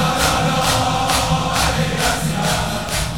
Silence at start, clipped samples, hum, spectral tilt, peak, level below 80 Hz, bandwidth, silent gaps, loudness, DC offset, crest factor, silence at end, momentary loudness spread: 0 s; under 0.1%; none; -3.5 dB/octave; -2 dBFS; -30 dBFS; 18 kHz; none; -17 LUFS; 1%; 16 dB; 0 s; 3 LU